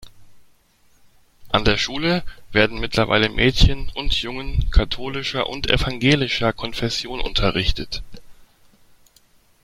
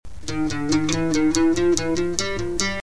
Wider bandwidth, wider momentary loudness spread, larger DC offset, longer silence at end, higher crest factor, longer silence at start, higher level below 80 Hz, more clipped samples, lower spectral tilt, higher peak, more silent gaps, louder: first, 13 kHz vs 11 kHz; about the same, 8 LU vs 7 LU; second, under 0.1% vs 3%; first, 1.2 s vs 0 s; about the same, 20 dB vs 20 dB; about the same, 0 s vs 0 s; first, -28 dBFS vs -40 dBFS; neither; about the same, -5 dB/octave vs -4 dB/octave; about the same, 0 dBFS vs -2 dBFS; neither; about the same, -21 LUFS vs -22 LUFS